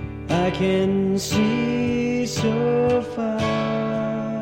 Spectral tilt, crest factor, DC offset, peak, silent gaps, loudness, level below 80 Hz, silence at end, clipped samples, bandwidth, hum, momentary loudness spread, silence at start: -6 dB/octave; 14 dB; under 0.1%; -8 dBFS; none; -22 LUFS; -44 dBFS; 0 s; under 0.1%; 16.5 kHz; none; 4 LU; 0 s